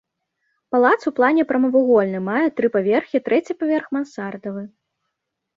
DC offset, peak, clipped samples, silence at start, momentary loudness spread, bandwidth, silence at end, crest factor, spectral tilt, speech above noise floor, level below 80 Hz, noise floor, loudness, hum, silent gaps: under 0.1%; -2 dBFS; under 0.1%; 0.7 s; 13 LU; 7.6 kHz; 0.9 s; 18 dB; -7.5 dB/octave; 60 dB; -66 dBFS; -79 dBFS; -19 LUFS; none; none